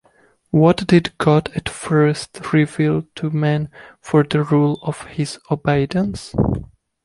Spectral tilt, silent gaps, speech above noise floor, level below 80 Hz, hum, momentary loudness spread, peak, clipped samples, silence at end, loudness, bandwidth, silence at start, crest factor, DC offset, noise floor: -7 dB/octave; none; 39 dB; -42 dBFS; none; 11 LU; -2 dBFS; under 0.1%; 0.4 s; -19 LUFS; 11.5 kHz; 0.55 s; 16 dB; under 0.1%; -56 dBFS